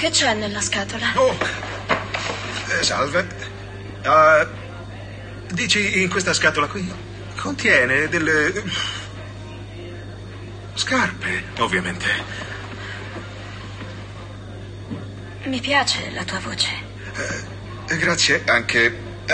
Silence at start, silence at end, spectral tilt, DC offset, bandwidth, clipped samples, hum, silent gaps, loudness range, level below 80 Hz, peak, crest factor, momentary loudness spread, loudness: 0 s; 0 s; -3 dB/octave; under 0.1%; 10 kHz; under 0.1%; none; none; 7 LU; -44 dBFS; -2 dBFS; 20 dB; 19 LU; -20 LUFS